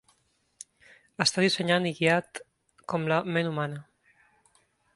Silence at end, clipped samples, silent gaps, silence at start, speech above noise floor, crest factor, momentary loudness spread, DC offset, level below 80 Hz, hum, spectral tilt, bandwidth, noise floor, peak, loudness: 1.15 s; under 0.1%; none; 1.2 s; 43 dB; 24 dB; 24 LU; under 0.1%; -70 dBFS; none; -4.5 dB/octave; 11.5 kHz; -70 dBFS; -6 dBFS; -27 LUFS